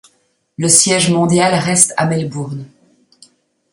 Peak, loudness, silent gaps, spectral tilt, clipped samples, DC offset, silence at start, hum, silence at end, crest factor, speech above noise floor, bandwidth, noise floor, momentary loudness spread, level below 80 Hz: 0 dBFS; -12 LUFS; none; -3.5 dB/octave; under 0.1%; under 0.1%; 0.6 s; none; 1.05 s; 16 dB; 46 dB; 16 kHz; -60 dBFS; 15 LU; -56 dBFS